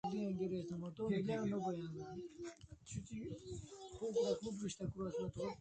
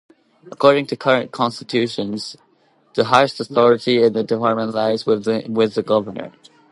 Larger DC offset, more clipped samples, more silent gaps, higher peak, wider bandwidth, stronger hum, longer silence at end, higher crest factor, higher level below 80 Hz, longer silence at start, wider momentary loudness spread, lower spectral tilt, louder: neither; neither; neither; second, -26 dBFS vs 0 dBFS; second, 9 kHz vs 11.5 kHz; neither; second, 0.05 s vs 0.45 s; about the same, 18 dB vs 18 dB; about the same, -66 dBFS vs -64 dBFS; second, 0.05 s vs 0.45 s; about the same, 12 LU vs 11 LU; about the same, -6.5 dB/octave vs -5.5 dB/octave; second, -44 LUFS vs -18 LUFS